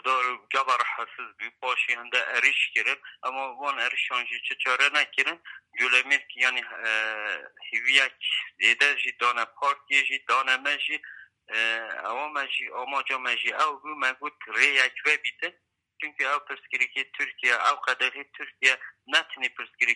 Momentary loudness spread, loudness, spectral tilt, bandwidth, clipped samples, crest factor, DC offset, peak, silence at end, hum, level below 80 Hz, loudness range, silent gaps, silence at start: 11 LU; -25 LUFS; 1.5 dB/octave; 11.5 kHz; under 0.1%; 24 dB; under 0.1%; -4 dBFS; 0 s; none; -84 dBFS; 4 LU; none; 0.05 s